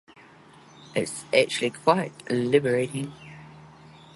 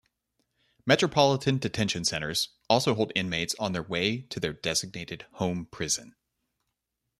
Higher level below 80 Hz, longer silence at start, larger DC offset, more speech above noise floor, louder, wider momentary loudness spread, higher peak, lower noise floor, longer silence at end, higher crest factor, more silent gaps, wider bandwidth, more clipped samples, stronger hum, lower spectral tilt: second, -66 dBFS vs -60 dBFS; about the same, 0.8 s vs 0.85 s; neither; second, 27 dB vs 55 dB; about the same, -25 LUFS vs -27 LUFS; first, 17 LU vs 10 LU; about the same, -4 dBFS vs -6 dBFS; second, -51 dBFS vs -83 dBFS; second, 0.5 s vs 1.1 s; about the same, 22 dB vs 22 dB; neither; second, 11.5 kHz vs 14 kHz; neither; neither; about the same, -4.5 dB/octave vs -4 dB/octave